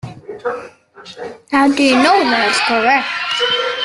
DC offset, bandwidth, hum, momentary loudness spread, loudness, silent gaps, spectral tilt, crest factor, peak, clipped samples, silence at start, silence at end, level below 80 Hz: under 0.1%; 12 kHz; none; 19 LU; -14 LUFS; none; -3 dB/octave; 14 dB; 0 dBFS; under 0.1%; 0.05 s; 0 s; -58 dBFS